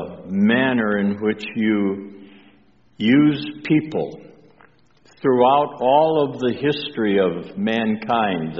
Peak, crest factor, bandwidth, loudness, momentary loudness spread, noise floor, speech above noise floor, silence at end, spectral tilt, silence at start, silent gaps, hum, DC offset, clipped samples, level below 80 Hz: -4 dBFS; 16 dB; 7.2 kHz; -19 LUFS; 10 LU; -55 dBFS; 36 dB; 0 s; -4.5 dB/octave; 0 s; none; none; 0.1%; under 0.1%; -60 dBFS